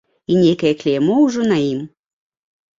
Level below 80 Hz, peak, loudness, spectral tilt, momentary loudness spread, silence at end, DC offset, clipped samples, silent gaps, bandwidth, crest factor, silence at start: -56 dBFS; -4 dBFS; -16 LUFS; -6.5 dB/octave; 9 LU; 0.9 s; under 0.1%; under 0.1%; none; 7.6 kHz; 14 dB; 0.3 s